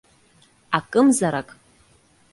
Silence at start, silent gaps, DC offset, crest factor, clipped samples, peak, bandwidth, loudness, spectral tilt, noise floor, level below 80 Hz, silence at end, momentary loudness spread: 0.7 s; none; under 0.1%; 22 dB; under 0.1%; -2 dBFS; 11.5 kHz; -20 LUFS; -4.5 dB/octave; -58 dBFS; -62 dBFS; 0.9 s; 13 LU